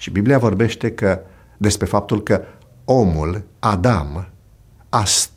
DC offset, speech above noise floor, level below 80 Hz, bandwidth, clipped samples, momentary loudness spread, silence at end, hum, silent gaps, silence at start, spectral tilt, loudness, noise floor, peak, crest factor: under 0.1%; 30 dB; -36 dBFS; 16 kHz; under 0.1%; 10 LU; 0.1 s; none; none; 0 s; -5 dB/octave; -18 LUFS; -48 dBFS; -2 dBFS; 18 dB